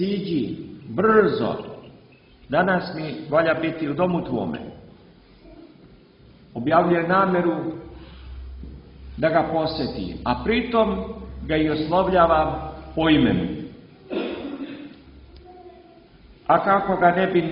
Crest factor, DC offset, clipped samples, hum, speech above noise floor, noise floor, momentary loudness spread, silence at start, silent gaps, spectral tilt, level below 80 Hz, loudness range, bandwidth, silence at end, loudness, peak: 20 dB; under 0.1%; under 0.1%; none; 30 dB; -51 dBFS; 21 LU; 0 s; none; -10.5 dB/octave; -44 dBFS; 5 LU; 5.6 kHz; 0 s; -22 LUFS; -4 dBFS